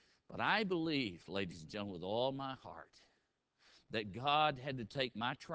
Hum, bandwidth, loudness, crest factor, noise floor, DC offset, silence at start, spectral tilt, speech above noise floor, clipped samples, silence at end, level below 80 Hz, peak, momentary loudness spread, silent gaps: none; 8 kHz; -38 LUFS; 22 dB; -81 dBFS; under 0.1%; 0.3 s; -5.5 dB/octave; 42 dB; under 0.1%; 0 s; -70 dBFS; -18 dBFS; 12 LU; none